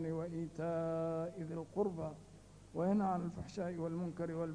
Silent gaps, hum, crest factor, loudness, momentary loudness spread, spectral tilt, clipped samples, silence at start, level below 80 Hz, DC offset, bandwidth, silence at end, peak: none; none; 16 dB; -40 LUFS; 11 LU; -8.5 dB/octave; under 0.1%; 0 s; -66 dBFS; under 0.1%; 10.5 kHz; 0 s; -22 dBFS